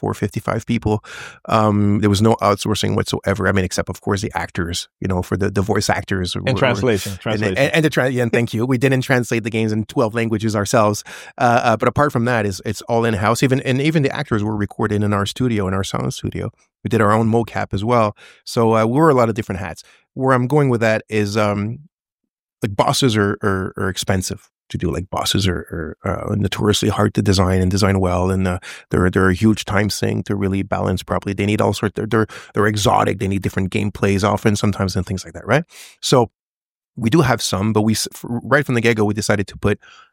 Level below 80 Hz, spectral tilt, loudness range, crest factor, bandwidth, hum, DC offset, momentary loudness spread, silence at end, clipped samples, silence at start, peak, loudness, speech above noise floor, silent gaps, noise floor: -44 dBFS; -5.5 dB/octave; 3 LU; 18 dB; 17 kHz; none; under 0.1%; 9 LU; 0.35 s; under 0.1%; 0 s; 0 dBFS; -18 LUFS; over 72 dB; 21.93-21.98 s, 22.12-22.18 s, 22.30-22.47 s, 22.53-22.57 s, 36.39-36.80 s; under -90 dBFS